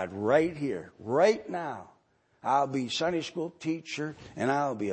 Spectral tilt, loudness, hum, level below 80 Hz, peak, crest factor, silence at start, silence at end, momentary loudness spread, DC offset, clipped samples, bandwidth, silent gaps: -5 dB/octave; -30 LUFS; none; -68 dBFS; -10 dBFS; 20 dB; 0 s; 0 s; 12 LU; under 0.1%; under 0.1%; 8.8 kHz; none